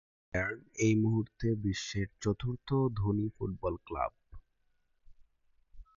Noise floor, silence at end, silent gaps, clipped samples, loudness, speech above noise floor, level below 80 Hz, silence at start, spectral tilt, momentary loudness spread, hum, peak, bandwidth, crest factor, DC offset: -74 dBFS; 0.15 s; none; under 0.1%; -34 LUFS; 42 dB; -52 dBFS; 0.35 s; -6.5 dB/octave; 8 LU; none; -16 dBFS; 7.6 kHz; 18 dB; under 0.1%